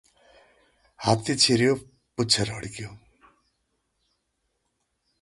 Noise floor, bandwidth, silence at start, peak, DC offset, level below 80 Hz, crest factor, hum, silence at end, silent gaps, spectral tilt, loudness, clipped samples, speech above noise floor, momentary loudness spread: -76 dBFS; 11.5 kHz; 1 s; -6 dBFS; under 0.1%; -58 dBFS; 24 dB; none; 2.25 s; none; -3.5 dB/octave; -23 LUFS; under 0.1%; 52 dB; 19 LU